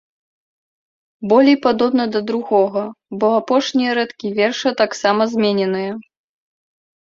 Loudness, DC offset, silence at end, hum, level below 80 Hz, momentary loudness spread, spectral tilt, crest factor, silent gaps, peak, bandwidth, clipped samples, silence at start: -17 LUFS; under 0.1%; 1 s; none; -62 dBFS; 10 LU; -5 dB/octave; 16 dB; none; -2 dBFS; 7.6 kHz; under 0.1%; 1.2 s